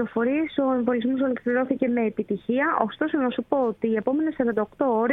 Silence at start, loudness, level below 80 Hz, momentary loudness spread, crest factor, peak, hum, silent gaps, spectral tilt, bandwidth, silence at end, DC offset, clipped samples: 0 s; -24 LUFS; -62 dBFS; 2 LU; 18 dB; -4 dBFS; none; none; -9 dB/octave; 4 kHz; 0 s; under 0.1%; under 0.1%